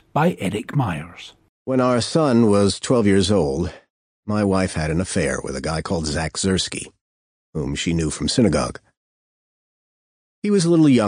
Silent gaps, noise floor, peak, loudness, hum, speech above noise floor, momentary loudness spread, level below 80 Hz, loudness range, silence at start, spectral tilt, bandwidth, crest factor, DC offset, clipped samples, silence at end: 1.49-1.66 s, 3.90-4.23 s, 7.01-7.53 s, 8.97-10.42 s; under -90 dBFS; -4 dBFS; -20 LUFS; none; over 71 dB; 13 LU; -44 dBFS; 5 LU; 0.15 s; -5.5 dB/octave; 13 kHz; 18 dB; under 0.1%; under 0.1%; 0 s